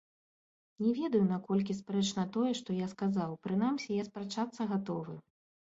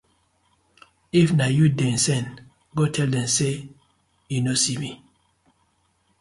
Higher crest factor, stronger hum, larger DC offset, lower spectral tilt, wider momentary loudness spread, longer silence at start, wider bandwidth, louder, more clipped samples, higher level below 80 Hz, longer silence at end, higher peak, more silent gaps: about the same, 16 dB vs 18 dB; neither; neither; first, -6.5 dB/octave vs -4.5 dB/octave; second, 8 LU vs 13 LU; second, 0.8 s vs 1.15 s; second, 8 kHz vs 11.5 kHz; second, -34 LUFS vs -22 LUFS; neither; second, -74 dBFS vs -56 dBFS; second, 0.5 s vs 1.25 s; second, -18 dBFS vs -6 dBFS; neither